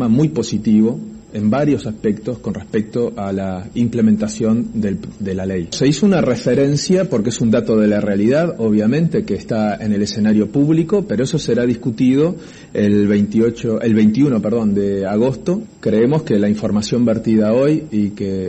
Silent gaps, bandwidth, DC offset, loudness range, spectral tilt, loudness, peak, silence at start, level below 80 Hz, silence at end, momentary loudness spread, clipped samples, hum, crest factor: none; 8.6 kHz; under 0.1%; 3 LU; -7 dB/octave; -16 LUFS; -4 dBFS; 0 s; -46 dBFS; 0 s; 7 LU; under 0.1%; none; 12 dB